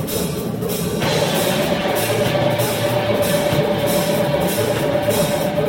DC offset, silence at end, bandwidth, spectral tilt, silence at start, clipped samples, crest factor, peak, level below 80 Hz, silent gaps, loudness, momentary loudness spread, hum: under 0.1%; 0 s; 17 kHz; -4.5 dB/octave; 0 s; under 0.1%; 14 dB; -4 dBFS; -42 dBFS; none; -18 LUFS; 4 LU; none